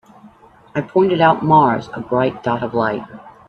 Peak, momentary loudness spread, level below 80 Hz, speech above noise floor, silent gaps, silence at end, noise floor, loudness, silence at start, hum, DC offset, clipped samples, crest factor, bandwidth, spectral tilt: 0 dBFS; 13 LU; -54 dBFS; 30 dB; none; 0.2 s; -46 dBFS; -17 LUFS; 0.25 s; none; under 0.1%; under 0.1%; 16 dB; 6.6 kHz; -8 dB/octave